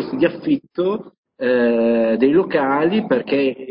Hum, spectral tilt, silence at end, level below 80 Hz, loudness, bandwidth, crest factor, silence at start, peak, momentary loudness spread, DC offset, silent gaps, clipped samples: none; -11.5 dB/octave; 0 s; -56 dBFS; -18 LUFS; 5.4 kHz; 14 dB; 0 s; -4 dBFS; 6 LU; under 0.1%; 1.18-1.23 s; under 0.1%